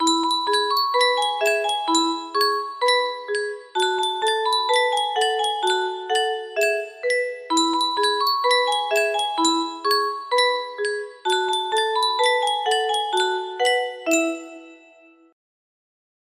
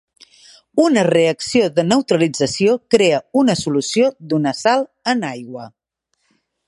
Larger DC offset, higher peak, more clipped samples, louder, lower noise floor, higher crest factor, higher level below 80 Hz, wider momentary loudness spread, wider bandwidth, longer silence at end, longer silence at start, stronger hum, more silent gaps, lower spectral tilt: neither; second, -6 dBFS vs 0 dBFS; neither; second, -21 LUFS vs -17 LUFS; second, -52 dBFS vs -69 dBFS; about the same, 16 dB vs 18 dB; second, -74 dBFS vs -58 dBFS; about the same, 6 LU vs 7 LU; first, 15.5 kHz vs 11.5 kHz; first, 1.55 s vs 1 s; second, 0 s vs 0.75 s; neither; neither; second, 0.5 dB/octave vs -5 dB/octave